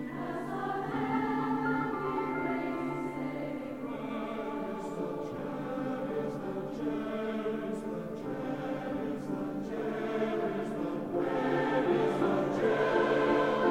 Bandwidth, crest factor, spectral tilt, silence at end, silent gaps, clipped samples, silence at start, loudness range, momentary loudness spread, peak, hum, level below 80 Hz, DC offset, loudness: 16 kHz; 16 dB; -7 dB/octave; 0 s; none; under 0.1%; 0 s; 7 LU; 10 LU; -16 dBFS; none; -62 dBFS; 0.1%; -33 LUFS